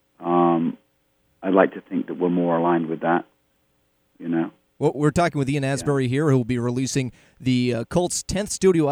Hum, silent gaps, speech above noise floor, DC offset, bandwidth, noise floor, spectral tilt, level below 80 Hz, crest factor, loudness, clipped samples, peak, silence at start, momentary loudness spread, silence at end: none; none; 45 dB; under 0.1%; 15.5 kHz; -67 dBFS; -6 dB/octave; -48 dBFS; 22 dB; -22 LUFS; under 0.1%; -2 dBFS; 0.2 s; 9 LU; 0 s